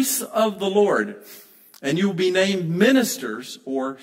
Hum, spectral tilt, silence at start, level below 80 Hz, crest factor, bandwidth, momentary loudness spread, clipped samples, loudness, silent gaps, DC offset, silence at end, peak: none; -4 dB/octave; 0 s; -70 dBFS; 18 dB; 16.5 kHz; 13 LU; under 0.1%; -21 LUFS; none; under 0.1%; 0 s; -4 dBFS